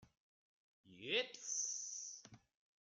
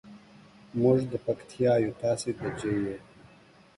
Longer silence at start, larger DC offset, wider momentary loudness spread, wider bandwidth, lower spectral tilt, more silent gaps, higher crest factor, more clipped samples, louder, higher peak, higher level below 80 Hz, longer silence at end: about the same, 0 s vs 0.05 s; neither; first, 13 LU vs 10 LU; about the same, 10.5 kHz vs 11.5 kHz; second, 0 dB/octave vs -7 dB/octave; first, 0.20-0.84 s vs none; first, 24 dB vs 18 dB; neither; second, -42 LUFS vs -28 LUFS; second, -24 dBFS vs -12 dBFS; second, -88 dBFS vs -60 dBFS; second, 0.45 s vs 0.75 s